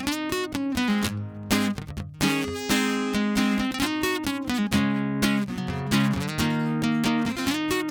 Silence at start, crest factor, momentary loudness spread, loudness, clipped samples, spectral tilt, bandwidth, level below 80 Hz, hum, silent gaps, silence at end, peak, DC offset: 0 s; 16 dB; 4 LU; -25 LUFS; under 0.1%; -4.5 dB/octave; 19 kHz; -46 dBFS; none; none; 0 s; -10 dBFS; under 0.1%